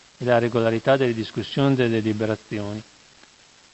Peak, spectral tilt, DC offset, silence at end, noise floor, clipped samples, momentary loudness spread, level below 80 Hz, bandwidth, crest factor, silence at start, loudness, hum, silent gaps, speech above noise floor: -4 dBFS; -7 dB/octave; under 0.1%; 0.9 s; -52 dBFS; under 0.1%; 11 LU; -56 dBFS; 8.4 kHz; 20 dB; 0.2 s; -22 LUFS; none; none; 31 dB